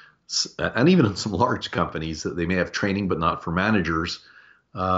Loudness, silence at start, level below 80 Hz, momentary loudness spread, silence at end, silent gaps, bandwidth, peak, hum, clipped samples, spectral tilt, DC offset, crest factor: -23 LUFS; 0.3 s; -46 dBFS; 10 LU; 0 s; none; 8 kHz; -6 dBFS; none; under 0.1%; -4.5 dB/octave; under 0.1%; 18 dB